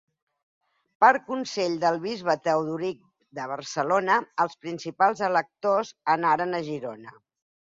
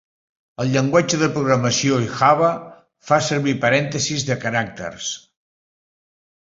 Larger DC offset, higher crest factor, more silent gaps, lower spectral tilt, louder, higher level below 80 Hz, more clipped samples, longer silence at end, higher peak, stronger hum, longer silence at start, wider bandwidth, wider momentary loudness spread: neither; about the same, 22 dB vs 18 dB; neither; about the same, -4.5 dB/octave vs -4.5 dB/octave; second, -25 LUFS vs -19 LUFS; second, -72 dBFS vs -56 dBFS; neither; second, 0.65 s vs 1.4 s; about the same, -4 dBFS vs -2 dBFS; neither; first, 1 s vs 0.6 s; about the same, 7.8 kHz vs 7.8 kHz; first, 14 LU vs 11 LU